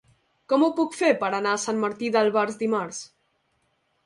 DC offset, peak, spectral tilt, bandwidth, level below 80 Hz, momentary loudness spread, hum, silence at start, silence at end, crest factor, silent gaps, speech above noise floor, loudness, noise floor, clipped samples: under 0.1%; -8 dBFS; -4 dB/octave; 11.5 kHz; -72 dBFS; 8 LU; none; 0.5 s; 1 s; 18 dB; none; 47 dB; -24 LUFS; -71 dBFS; under 0.1%